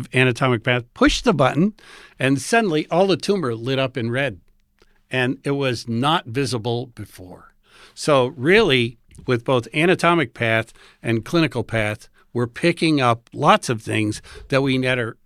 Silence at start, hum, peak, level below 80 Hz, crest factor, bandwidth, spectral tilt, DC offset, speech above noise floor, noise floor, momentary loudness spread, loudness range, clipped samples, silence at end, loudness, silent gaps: 0 s; none; 0 dBFS; -46 dBFS; 20 dB; 14 kHz; -5.5 dB/octave; under 0.1%; 38 dB; -58 dBFS; 9 LU; 4 LU; under 0.1%; 0.15 s; -20 LUFS; none